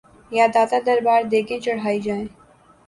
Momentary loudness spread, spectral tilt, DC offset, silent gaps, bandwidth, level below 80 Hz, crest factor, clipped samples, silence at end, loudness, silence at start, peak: 10 LU; -5 dB/octave; under 0.1%; none; 11.5 kHz; -58 dBFS; 16 dB; under 0.1%; 0.6 s; -20 LUFS; 0.3 s; -4 dBFS